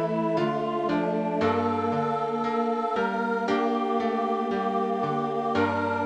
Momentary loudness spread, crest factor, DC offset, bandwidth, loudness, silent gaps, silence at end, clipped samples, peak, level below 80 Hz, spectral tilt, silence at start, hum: 2 LU; 14 dB; under 0.1%; 9.4 kHz; -26 LUFS; none; 0 s; under 0.1%; -12 dBFS; -68 dBFS; -7 dB/octave; 0 s; none